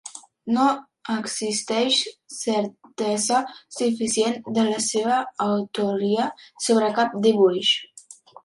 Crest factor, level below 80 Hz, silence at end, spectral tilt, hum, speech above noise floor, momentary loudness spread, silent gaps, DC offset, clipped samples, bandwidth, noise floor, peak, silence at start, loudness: 16 dB; -72 dBFS; 0.3 s; -3 dB/octave; none; 24 dB; 10 LU; none; under 0.1%; under 0.1%; 11.5 kHz; -47 dBFS; -6 dBFS; 0.05 s; -23 LUFS